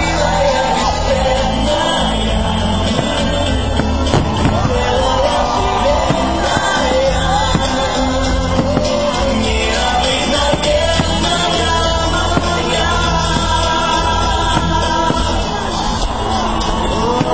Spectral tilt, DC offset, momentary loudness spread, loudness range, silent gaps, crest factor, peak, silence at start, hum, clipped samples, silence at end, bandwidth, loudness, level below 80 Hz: -4.5 dB/octave; 2%; 3 LU; 1 LU; none; 14 dB; 0 dBFS; 0 s; none; under 0.1%; 0 s; 8 kHz; -15 LUFS; -22 dBFS